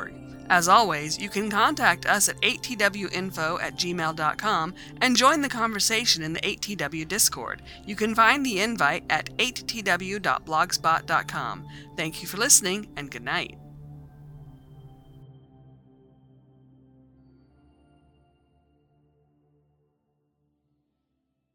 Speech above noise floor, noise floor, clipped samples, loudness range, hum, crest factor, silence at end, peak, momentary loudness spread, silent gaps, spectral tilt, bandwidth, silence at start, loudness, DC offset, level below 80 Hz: 53 dB; -78 dBFS; under 0.1%; 3 LU; none; 26 dB; 6.15 s; -2 dBFS; 15 LU; none; -2 dB/octave; over 20 kHz; 0 s; -23 LUFS; under 0.1%; -56 dBFS